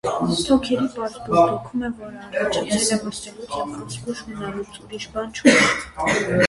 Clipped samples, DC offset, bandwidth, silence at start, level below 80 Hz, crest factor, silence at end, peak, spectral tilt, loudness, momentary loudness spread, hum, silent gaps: under 0.1%; under 0.1%; 11.5 kHz; 0.05 s; -48 dBFS; 22 dB; 0 s; 0 dBFS; -4 dB/octave; -21 LUFS; 15 LU; none; none